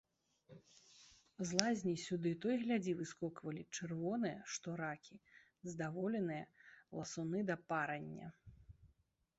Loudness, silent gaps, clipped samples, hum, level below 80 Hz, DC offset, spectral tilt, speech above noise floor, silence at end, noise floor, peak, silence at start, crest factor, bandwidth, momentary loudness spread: -42 LUFS; none; under 0.1%; none; -76 dBFS; under 0.1%; -5 dB/octave; 36 dB; 0.5 s; -77 dBFS; -12 dBFS; 0.5 s; 32 dB; 8 kHz; 19 LU